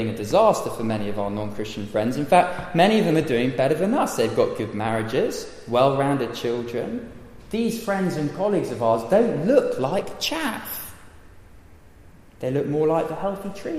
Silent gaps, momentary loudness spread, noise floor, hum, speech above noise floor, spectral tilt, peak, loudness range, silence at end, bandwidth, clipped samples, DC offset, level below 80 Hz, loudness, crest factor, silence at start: none; 12 LU; -48 dBFS; none; 25 dB; -5.5 dB/octave; -4 dBFS; 6 LU; 0 s; 15.5 kHz; under 0.1%; under 0.1%; -50 dBFS; -23 LUFS; 18 dB; 0 s